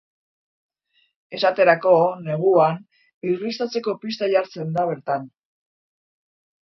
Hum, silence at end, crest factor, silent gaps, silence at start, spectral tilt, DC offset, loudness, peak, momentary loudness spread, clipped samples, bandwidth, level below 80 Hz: none; 1.4 s; 20 dB; 3.14-3.21 s; 1.3 s; -6.5 dB/octave; under 0.1%; -21 LUFS; -2 dBFS; 11 LU; under 0.1%; 6.2 kHz; -72 dBFS